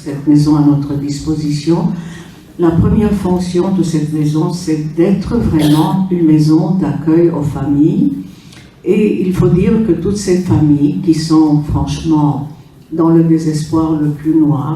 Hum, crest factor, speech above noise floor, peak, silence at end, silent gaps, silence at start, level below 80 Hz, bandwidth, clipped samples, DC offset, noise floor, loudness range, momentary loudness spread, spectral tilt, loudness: none; 12 dB; 25 dB; 0 dBFS; 0 s; none; 0 s; -32 dBFS; 13.5 kHz; under 0.1%; under 0.1%; -37 dBFS; 2 LU; 7 LU; -8 dB/octave; -13 LUFS